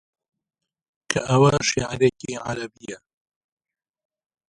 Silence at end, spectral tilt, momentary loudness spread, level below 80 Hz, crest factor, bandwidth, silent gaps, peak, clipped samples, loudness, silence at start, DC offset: 1.55 s; -5 dB/octave; 20 LU; -52 dBFS; 22 dB; 11.5 kHz; none; -2 dBFS; under 0.1%; -22 LUFS; 1.1 s; under 0.1%